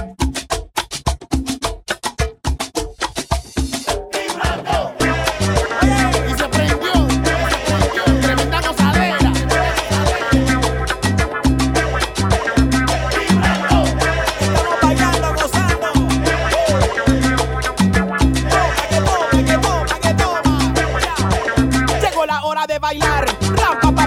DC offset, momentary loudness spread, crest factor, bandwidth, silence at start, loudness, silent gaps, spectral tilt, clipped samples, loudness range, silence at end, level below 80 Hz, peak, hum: under 0.1%; 7 LU; 16 dB; 16.5 kHz; 0 s; -17 LUFS; none; -5 dB/octave; under 0.1%; 5 LU; 0 s; -24 dBFS; 0 dBFS; none